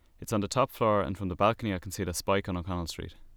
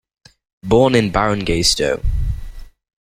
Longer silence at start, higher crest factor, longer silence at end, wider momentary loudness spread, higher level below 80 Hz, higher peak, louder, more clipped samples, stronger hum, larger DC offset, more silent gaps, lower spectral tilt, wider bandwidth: second, 0.2 s vs 0.65 s; about the same, 18 dB vs 16 dB; second, 0 s vs 0.35 s; second, 8 LU vs 13 LU; second, -50 dBFS vs -26 dBFS; second, -12 dBFS vs -2 dBFS; second, -30 LUFS vs -16 LUFS; neither; neither; neither; neither; about the same, -5 dB/octave vs -4.5 dB/octave; first, over 20 kHz vs 16 kHz